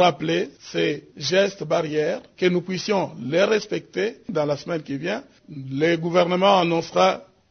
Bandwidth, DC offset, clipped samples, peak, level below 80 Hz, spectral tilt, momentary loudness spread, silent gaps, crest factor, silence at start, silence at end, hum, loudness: 6.6 kHz; under 0.1%; under 0.1%; -4 dBFS; -64 dBFS; -5 dB/octave; 10 LU; none; 20 dB; 0 s; 0.25 s; none; -22 LUFS